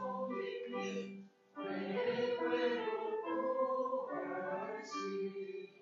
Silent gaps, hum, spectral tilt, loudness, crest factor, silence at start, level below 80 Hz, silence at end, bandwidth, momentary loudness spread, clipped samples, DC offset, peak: none; none; -3.5 dB/octave; -39 LUFS; 16 dB; 0 s; under -90 dBFS; 0.1 s; 7.4 kHz; 10 LU; under 0.1%; under 0.1%; -24 dBFS